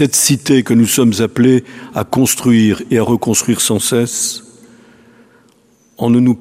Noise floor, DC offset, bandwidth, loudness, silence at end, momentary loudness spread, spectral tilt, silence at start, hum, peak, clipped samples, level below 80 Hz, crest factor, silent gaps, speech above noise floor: -52 dBFS; under 0.1%; 16 kHz; -13 LUFS; 0 s; 7 LU; -4.5 dB/octave; 0 s; none; 0 dBFS; under 0.1%; -50 dBFS; 14 dB; none; 39 dB